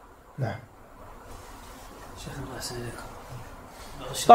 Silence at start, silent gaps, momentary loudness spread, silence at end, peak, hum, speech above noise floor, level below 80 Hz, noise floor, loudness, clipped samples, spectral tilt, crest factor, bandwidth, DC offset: 0.4 s; none; 12 LU; 0 s; 0 dBFS; none; 23 dB; -50 dBFS; -47 dBFS; -38 LUFS; under 0.1%; -4.5 dB/octave; 26 dB; 16 kHz; under 0.1%